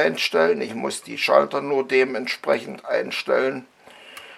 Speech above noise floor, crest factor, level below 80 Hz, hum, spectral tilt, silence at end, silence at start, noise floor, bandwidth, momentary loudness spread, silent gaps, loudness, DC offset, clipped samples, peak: 22 dB; 20 dB; -76 dBFS; none; -3.5 dB/octave; 0 s; 0 s; -44 dBFS; 14 kHz; 10 LU; none; -22 LUFS; under 0.1%; under 0.1%; -2 dBFS